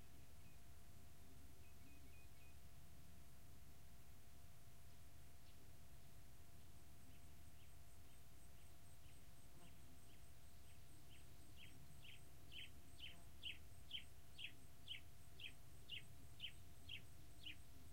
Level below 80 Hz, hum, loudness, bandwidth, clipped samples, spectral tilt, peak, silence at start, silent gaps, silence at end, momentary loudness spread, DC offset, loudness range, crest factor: -70 dBFS; none; -61 LUFS; 16 kHz; under 0.1%; -3 dB/octave; -38 dBFS; 0 s; none; 0 s; 11 LU; 0.2%; 10 LU; 22 dB